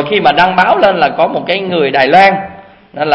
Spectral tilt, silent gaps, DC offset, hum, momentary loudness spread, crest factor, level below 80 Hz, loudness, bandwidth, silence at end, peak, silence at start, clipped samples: -6 dB/octave; none; under 0.1%; none; 10 LU; 10 dB; -48 dBFS; -10 LUFS; 8.6 kHz; 0 s; 0 dBFS; 0 s; 0.6%